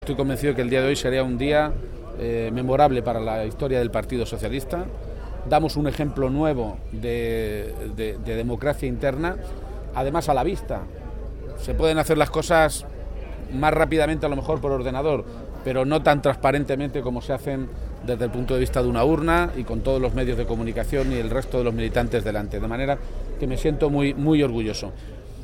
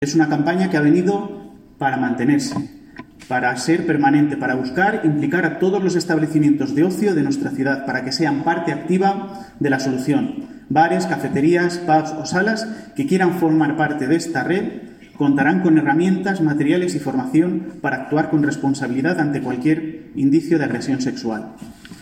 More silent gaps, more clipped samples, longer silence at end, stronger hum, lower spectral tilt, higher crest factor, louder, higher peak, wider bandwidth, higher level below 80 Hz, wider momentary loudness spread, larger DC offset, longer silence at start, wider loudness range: neither; neither; about the same, 0 s vs 0 s; neither; about the same, -6.5 dB/octave vs -6 dB/octave; about the same, 20 dB vs 16 dB; second, -24 LUFS vs -19 LUFS; about the same, -4 dBFS vs -4 dBFS; first, 17 kHz vs 15 kHz; first, -32 dBFS vs -56 dBFS; first, 13 LU vs 9 LU; neither; about the same, 0 s vs 0 s; about the same, 4 LU vs 2 LU